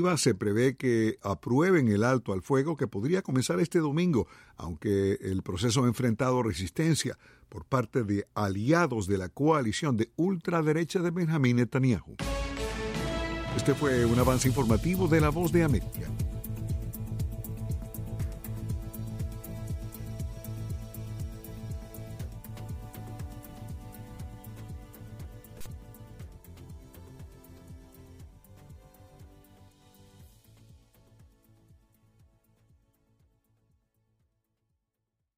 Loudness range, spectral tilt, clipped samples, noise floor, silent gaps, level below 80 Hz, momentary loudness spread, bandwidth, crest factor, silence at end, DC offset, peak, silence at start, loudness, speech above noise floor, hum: 19 LU; -6 dB/octave; under 0.1%; -84 dBFS; none; -44 dBFS; 20 LU; 16 kHz; 18 dB; 4.6 s; under 0.1%; -12 dBFS; 0 s; -29 LUFS; 57 dB; none